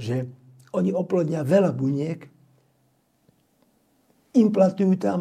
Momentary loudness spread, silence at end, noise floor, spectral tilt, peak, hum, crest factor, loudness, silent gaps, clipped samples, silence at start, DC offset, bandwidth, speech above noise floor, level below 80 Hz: 12 LU; 0 s; -66 dBFS; -8.5 dB/octave; -6 dBFS; none; 18 dB; -23 LUFS; none; under 0.1%; 0 s; under 0.1%; 10 kHz; 45 dB; -70 dBFS